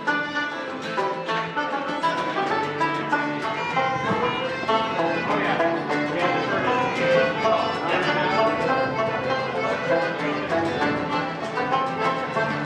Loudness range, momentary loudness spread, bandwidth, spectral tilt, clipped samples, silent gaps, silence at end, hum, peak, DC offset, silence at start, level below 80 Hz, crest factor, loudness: 3 LU; 5 LU; 11 kHz; -5.5 dB/octave; under 0.1%; none; 0 s; none; -8 dBFS; under 0.1%; 0 s; -60 dBFS; 16 dB; -23 LUFS